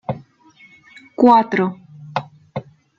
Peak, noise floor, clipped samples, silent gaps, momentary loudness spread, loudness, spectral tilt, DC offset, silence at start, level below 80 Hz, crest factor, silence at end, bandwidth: -2 dBFS; -50 dBFS; under 0.1%; none; 20 LU; -17 LUFS; -8 dB/octave; under 0.1%; 0.1 s; -60 dBFS; 18 dB; 0.4 s; 7.2 kHz